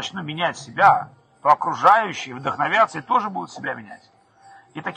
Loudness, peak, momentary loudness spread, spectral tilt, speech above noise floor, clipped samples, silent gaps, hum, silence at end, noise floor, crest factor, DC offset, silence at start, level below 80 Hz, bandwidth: -20 LUFS; -4 dBFS; 14 LU; -4 dB/octave; 30 dB; under 0.1%; none; none; 0 s; -50 dBFS; 18 dB; under 0.1%; 0 s; -68 dBFS; 9.8 kHz